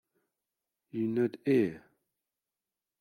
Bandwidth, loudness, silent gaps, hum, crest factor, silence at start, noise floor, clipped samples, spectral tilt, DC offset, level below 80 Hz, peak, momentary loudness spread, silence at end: 14 kHz; -31 LUFS; none; none; 18 dB; 0.95 s; under -90 dBFS; under 0.1%; -8.5 dB/octave; under 0.1%; -78 dBFS; -16 dBFS; 7 LU; 1.25 s